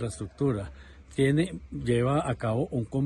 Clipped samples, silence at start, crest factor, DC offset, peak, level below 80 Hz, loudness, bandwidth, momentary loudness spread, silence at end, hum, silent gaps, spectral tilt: under 0.1%; 0 s; 16 dB; under 0.1%; -12 dBFS; -48 dBFS; -28 LUFS; 11.5 kHz; 10 LU; 0 s; none; none; -7 dB/octave